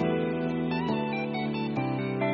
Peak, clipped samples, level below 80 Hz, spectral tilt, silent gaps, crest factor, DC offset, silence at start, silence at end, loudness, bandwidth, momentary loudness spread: -14 dBFS; under 0.1%; -58 dBFS; -6 dB/octave; none; 14 dB; under 0.1%; 0 s; 0 s; -29 LUFS; 6.6 kHz; 2 LU